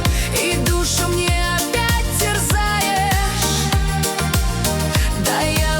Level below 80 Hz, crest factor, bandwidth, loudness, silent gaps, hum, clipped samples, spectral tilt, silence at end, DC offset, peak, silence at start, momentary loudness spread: -24 dBFS; 14 dB; over 20 kHz; -18 LUFS; none; none; under 0.1%; -3.5 dB/octave; 0 s; under 0.1%; -4 dBFS; 0 s; 2 LU